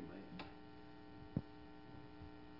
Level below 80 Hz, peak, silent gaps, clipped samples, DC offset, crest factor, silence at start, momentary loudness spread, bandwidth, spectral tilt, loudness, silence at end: -68 dBFS; -26 dBFS; none; under 0.1%; under 0.1%; 26 dB; 0 s; 10 LU; 5.8 kHz; -6 dB/octave; -54 LUFS; 0 s